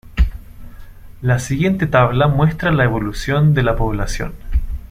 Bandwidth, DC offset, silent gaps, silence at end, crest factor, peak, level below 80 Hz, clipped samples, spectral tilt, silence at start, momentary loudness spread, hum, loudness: 15 kHz; under 0.1%; none; 0.05 s; 14 dB; -2 dBFS; -24 dBFS; under 0.1%; -6.5 dB/octave; 0.05 s; 10 LU; none; -17 LUFS